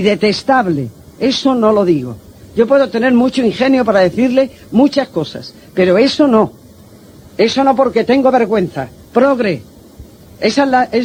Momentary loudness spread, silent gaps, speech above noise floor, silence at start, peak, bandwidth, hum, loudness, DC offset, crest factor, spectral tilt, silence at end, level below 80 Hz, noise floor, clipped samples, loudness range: 11 LU; none; 27 dB; 0 s; 0 dBFS; 16 kHz; none; -13 LUFS; under 0.1%; 14 dB; -6 dB/octave; 0 s; -48 dBFS; -39 dBFS; under 0.1%; 2 LU